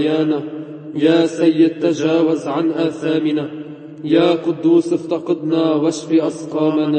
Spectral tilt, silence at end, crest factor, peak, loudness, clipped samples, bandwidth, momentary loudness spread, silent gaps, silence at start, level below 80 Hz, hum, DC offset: -6.5 dB/octave; 0 s; 14 dB; -2 dBFS; -17 LUFS; under 0.1%; 8.8 kHz; 11 LU; none; 0 s; -66 dBFS; none; under 0.1%